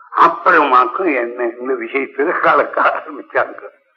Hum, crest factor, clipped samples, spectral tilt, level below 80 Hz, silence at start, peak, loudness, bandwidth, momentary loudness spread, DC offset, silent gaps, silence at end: none; 16 dB; under 0.1%; -6 dB/octave; -74 dBFS; 0.1 s; 0 dBFS; -15 LUFS; 7.2 kHz; 11 LU; under 0.1%; none; 0.3 s